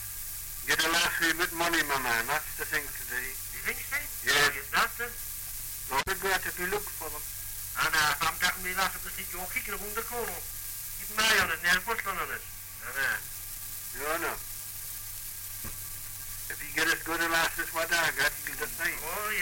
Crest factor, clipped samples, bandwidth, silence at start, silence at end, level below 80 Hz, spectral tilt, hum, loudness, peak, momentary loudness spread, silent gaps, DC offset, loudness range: 18 dB; under 0.1%; 17 kHz; 0 s; 0 s; -50 dBFS; -1 dB/octave; none; -29 LUFS; -14 dBFS; 12 LU; none; under 0.1%; 6 LU